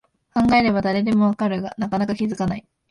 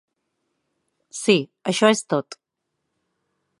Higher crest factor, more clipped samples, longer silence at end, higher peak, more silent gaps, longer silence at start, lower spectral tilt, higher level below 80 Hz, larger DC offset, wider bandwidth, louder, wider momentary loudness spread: second, 16 dB vs 22 dB; neither; second, 0.3 s vs 1.25 s; about the same, -4 dBFS vs -2 dBFS; neither; second, 0.35 s vs 1.15 s; first, -7 dB/octave vs -4 dB/octave; first, -48 dBFS vs -76 dBFS; neither; about the same, 10.5 kHz vs 11.5 kHz; about the same, -21 LUFS vs -21 LUFS; second, 9 LU vs 14 LU